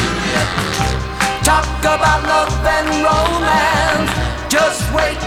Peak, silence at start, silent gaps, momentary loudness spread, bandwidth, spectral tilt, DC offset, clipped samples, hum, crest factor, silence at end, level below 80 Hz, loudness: -2 dBFS; 0 s; none; 5 LU; 20 kHz; -4 dB/octave; 0.1%; under 0.1%; none; 14 dB; 0 s; -26 dBFS; -15 LUFS